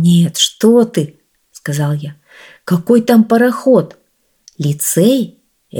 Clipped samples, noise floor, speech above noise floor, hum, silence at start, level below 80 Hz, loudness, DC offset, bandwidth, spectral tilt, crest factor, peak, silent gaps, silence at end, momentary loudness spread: under 0.1%; -49 dBFS; 37 dB; none; 0 s; -60 dBFS; -13 LUFS; under 0.1%; 19 kHz; -5.5 dB/octave; 14 dB; 0 dBFS; none; 0 s; 15 LU